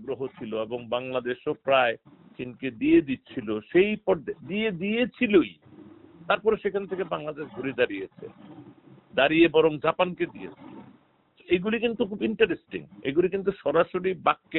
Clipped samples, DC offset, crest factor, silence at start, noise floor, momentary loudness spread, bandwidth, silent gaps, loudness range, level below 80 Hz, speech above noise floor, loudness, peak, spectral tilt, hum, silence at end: under 0.1%; under 0.1%; 20 dB; 0 s; -61 dBFS; 13 LU; 4.1 kHz; none; 3 LU; -60 dBFS; 35 dB; -26 LUFS; -6 dBFS; -3.5 dB/octave; none; 0 s